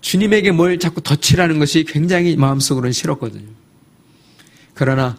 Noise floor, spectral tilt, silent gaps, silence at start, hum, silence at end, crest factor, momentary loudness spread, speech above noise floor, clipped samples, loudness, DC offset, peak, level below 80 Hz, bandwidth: -50 dBFS; -5 dB/octave; none; 0.05 s; none; 0 s; 16 dB; 7 LU; 35 dB; under 0.1%; -15 LUFS; under 0.1%; 0 dBFS; -42 dBFS; 15.5 kHz